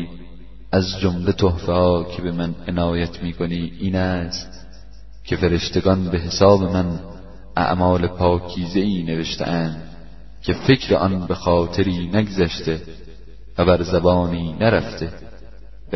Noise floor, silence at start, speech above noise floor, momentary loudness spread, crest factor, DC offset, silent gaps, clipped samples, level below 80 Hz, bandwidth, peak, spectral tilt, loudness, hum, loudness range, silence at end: -41 dBFS; 0 s; 22 dB; 13 LU; 20 dB; 1%; none; under 0.1%; -38 dBFS; 6.2 kHz; 0 dBFS; -6.5 dB/octave; -20 LUFS; none; 4 LU; 0 s